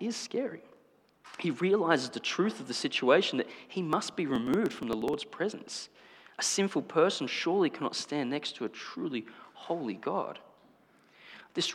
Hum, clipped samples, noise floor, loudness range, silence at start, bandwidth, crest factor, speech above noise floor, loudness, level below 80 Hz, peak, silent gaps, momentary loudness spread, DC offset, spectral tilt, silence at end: 50 Hz at -70 dBFS; under 0.1%; -64 dBFS; 6 LU; 0 s; 16 kHz; 22 dB; 33 dB; -31 LUFS; -72 dBFS; -10 dBFS; none; 14 LU; under 0.1%; -4 dB/octave; 0 s